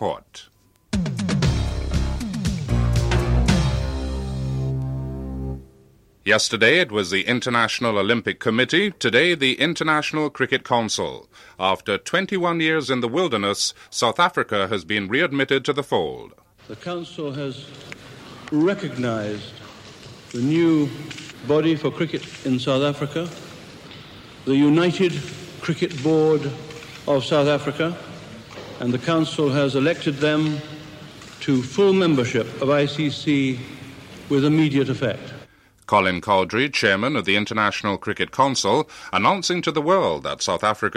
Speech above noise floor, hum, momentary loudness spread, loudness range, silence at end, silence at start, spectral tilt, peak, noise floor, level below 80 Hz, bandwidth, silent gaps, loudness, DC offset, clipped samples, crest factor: 33 dB; none; 19 LU; 5 LU; 0 s; 0 s; -5 dB/octave; -4 dBFS; -54 dBFS; -36 dBFS; 15 kHz; none; -21 LUFS; under 0.1%; under 0.1%; 18 dB